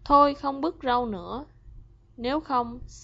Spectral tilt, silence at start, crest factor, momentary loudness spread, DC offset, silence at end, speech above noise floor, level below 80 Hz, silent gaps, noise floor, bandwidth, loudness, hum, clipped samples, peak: -6 dB/octave; 0.05 s; 20 dB; 16 LU; under 0.1%; 0 s; 23 dB; -48 dBFS; none; -48 dBFS; 8 kHz; -26 LUFS; 50 Hz at -50 dBFS; under 0.1%; -8 dBFS